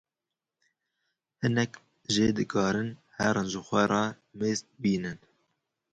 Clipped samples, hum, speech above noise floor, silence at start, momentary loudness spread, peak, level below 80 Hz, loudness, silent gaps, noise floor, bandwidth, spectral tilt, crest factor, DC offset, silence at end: under 0.1%; none; 61 dB; 1.4 s; 8 LU; -10 dBFS; -60 dBFS; -29 LUFS; none; -89 dBFS; 9.2 kHz; -5 dB/octave; 20 dB; under 0.1%; 0.75 s